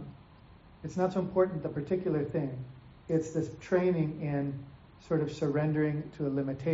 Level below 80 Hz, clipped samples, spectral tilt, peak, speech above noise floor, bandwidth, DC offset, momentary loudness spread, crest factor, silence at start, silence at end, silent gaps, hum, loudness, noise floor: -60 dBFS; under 0.1%; -8 dB/octave; -14 dBFS; 24 dB; 7.6 kHz; under 0.1%; 15 LU; 18 dB; 0 s; 0 s; none; none; -32 LUFS; -55 dBFS